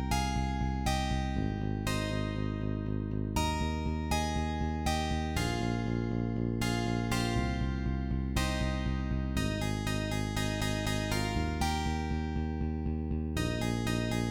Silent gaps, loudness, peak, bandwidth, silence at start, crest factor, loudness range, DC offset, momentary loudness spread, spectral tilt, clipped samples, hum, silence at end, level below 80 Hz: none; -33 LUFS; -16 dBFS; 19 kHz; 0 s; 14 dB; 1 LU; 0.1%; 3 LU; -5.5 dB/octave; under 0.1%; none; 0 s; -38 dBFS